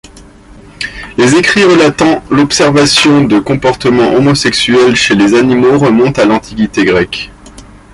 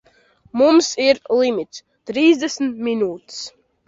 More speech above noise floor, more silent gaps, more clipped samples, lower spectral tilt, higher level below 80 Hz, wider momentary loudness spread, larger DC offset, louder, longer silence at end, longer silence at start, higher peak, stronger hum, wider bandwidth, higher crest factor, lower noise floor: second, 27 dB vs 37 dB; neither; neither; about the same, -4.5 dB/octave vs -3.5 dB/octave; first, -36 dBFS vs -62 dBFS; second, 9 LU vs 17 LU; neither; first, -8 LUFS vs -18 LUFS; about the same, 0.3 s vs 0.4 s; second, 0.15 s vs 0.55 s; about the same, 0 dBFS vs -2 dBFS; neither; first, 11.5 kHz vs 7.8 kHz; second, 8 dB vs 16 dB; second, -35 dBFS vs -55 dBFS